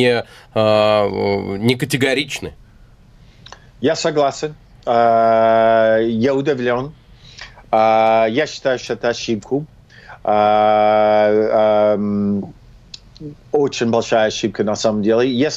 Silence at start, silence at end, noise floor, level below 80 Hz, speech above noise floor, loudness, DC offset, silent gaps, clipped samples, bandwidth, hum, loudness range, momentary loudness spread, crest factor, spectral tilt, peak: 0 s; 0 s; -46 dBFS; -48 dBFS; 30 dB; -16 LUFS; under 0.1%; none; under 0.1%; 14.5 kHz; none; 4 LU; 14 LU; 16 dB; -5 dB/octave; 0 dBFS